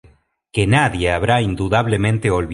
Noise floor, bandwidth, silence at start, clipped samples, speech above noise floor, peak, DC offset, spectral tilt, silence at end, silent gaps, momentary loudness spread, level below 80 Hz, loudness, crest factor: -53 dBFS; 11.5 kHz; 0.55 s; under 0.1%; 36 dB; -2 dBFS; under 0.1%; -6 dB/octave; 0 s; none; 4 LU; -34 dBFS; -17 LUFS; 16 dB